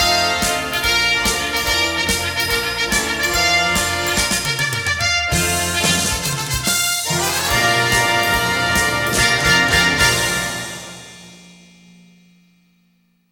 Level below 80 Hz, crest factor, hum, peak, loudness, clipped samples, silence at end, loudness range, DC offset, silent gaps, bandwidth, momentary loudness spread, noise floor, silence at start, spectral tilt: -36 dBFS; 18 dB; none; -2 dBFS; -16 LUFS; under 0.1%; 1.8 s; 3 LU; under 0.1%; none; 18 kHz; 5 LU; -60 dBFS; 0 s; -2 dB/octave